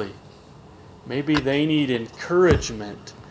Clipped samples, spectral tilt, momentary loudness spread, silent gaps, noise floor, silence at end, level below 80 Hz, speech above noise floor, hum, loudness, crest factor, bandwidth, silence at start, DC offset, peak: under 0.1%; -5.5 dB/octave; 16 LU; none; -46 dBFS; 0 s; -38 dBFS; 25 dB; none; -22 LUFS; 20 dB; 8 kHz; 0 s; under 0.1%; -2 dBFS